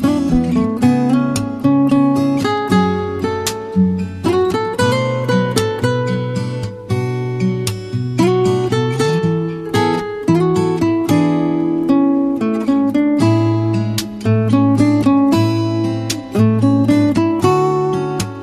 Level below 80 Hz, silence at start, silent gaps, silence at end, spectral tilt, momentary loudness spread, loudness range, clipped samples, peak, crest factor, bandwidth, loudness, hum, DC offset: -42 dBFS; 0 s; none; 0 s; -6.5 dB/octave; 7 LU; 3 LU; under 0.1%; 0 dBFS; 14 dB; 14 kHz; -16 LUFS; none; under 0.1%